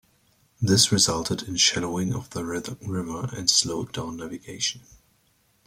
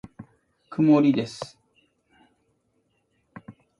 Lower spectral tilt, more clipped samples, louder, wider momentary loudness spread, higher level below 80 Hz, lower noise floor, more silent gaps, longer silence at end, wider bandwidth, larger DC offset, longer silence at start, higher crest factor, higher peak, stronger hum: second, -3 dB/octave vs -7.5 dB/octave; neither; second, -24 LUFS vs -21 LUFS; second, 14 LU vs 22 LU; first, -54 dBFS vs -66 dBFS; second, -65 dBFS vs -71 dBFS; neither; first, 0.9 s vs 0.3 s; first, 16.5 kHz vs 11 kHz; neither; first, 0.6 s vs 0.2 s; about the same, 22 dB vs 20 dB; first, -4 dBFS vs -8 dBFS; neither